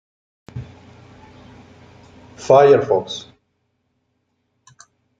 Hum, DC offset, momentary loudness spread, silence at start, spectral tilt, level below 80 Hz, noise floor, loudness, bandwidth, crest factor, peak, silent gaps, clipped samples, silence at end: none; under 0.1%; 25 LU; 0.55 s; -5.5 dB/octave; -58 dBFS; -70 dBFS; -14 LUFS; 7.8 kHz; 20 dB; -2 dBFS; none; under 0.1%; 2 s